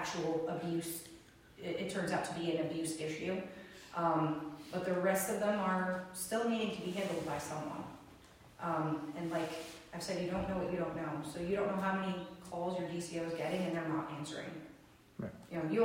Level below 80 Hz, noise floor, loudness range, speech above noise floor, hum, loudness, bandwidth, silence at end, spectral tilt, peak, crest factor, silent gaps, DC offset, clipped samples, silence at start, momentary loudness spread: -66 dBFS; -60 dBFS; 5 LU; 23 dB; none; -38 LUFS; 16 kHz; 0 s; -5 dB/octave; -20 dBFS; 18 dB; none; under 0.1%; under 0.1%; 0 s; 13 LU